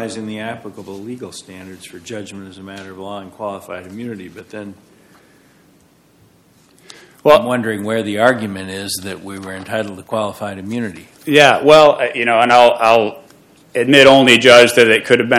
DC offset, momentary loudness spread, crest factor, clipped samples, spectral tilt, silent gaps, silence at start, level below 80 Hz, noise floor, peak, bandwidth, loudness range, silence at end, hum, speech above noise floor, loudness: under 0.1%; 25 LU; 16 dB; 0.7%; -4 dB/octave; none; 0 s; -56 dBFS; -52 dBFS; 0 dBFS; 16.5 kHz; 21 LU; 0 s; none; 37 dB; -12 LUFS